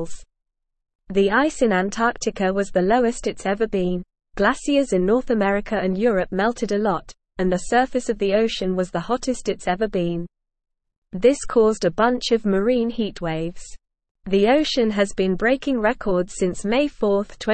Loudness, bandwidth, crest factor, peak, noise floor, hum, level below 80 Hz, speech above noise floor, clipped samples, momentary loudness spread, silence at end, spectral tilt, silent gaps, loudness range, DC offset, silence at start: -21 LUFS; 8.8 kHz; 16 dB; -4 dBFS; -78 dBFS; none; -42 dBFS; 57 dB; under 0.1%; 7 LU; 0 s; -5 dB/octave; 0.95-0.99 s, 10.98-11.02 s, 14.11-14.15 s; 2 LU; 0.4%; 0 s